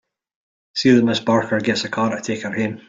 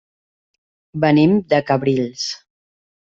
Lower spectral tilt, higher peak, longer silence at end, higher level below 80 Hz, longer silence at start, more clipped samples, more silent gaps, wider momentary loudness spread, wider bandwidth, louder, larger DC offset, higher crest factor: about the same, -5 dB/octave vs -6 dB/octave; about the same, -2 dBFS vs -2 dBFS; second, 0.1 s vs 0.65 s; about the same, -60 dBFS vs -56 dBFS; second, 0.75 s vs 0.95 s; neither; neither; second, 10 LU vs 14 LU; about the same, 7.8 kHz vs 7.6 kHz; about the same, -19 LUFS vs -17 LUFS; neither; about the same, 18 dB vs 16 dB